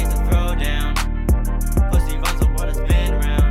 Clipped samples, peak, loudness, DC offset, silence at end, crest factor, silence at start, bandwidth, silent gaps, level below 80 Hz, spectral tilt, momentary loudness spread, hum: under 0.1%; -6 dBFS; -20 LUFS; under 0.1%; 0 s; 10 dB; 0 s; 15.5 kHz; none; -18 dBFS; -5.5 dB/octave; 3 LU; none